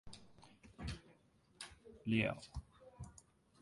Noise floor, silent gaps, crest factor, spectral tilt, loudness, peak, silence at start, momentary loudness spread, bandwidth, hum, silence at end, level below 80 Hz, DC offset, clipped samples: -70 dBFS; none; 26 dB; -5.5 dB/octave; -43 LUFS; -20 dBFS; 0.05 s; 26 LU; 11.5 kHz; none; 0.5 s; -60 dBFS; under 0.1%; under 0.1%